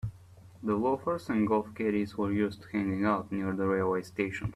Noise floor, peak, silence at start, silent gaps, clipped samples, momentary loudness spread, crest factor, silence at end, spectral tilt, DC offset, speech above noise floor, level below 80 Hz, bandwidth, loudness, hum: -53 dBFS; -14 dBFS; 0.05 s; none; under 0.1%; 5 LU; 16 dB; 0 s; -8 dB/octave; under 0.1%; 23 dB; -58 dBFS; 13 kHz; -31 LUFS; none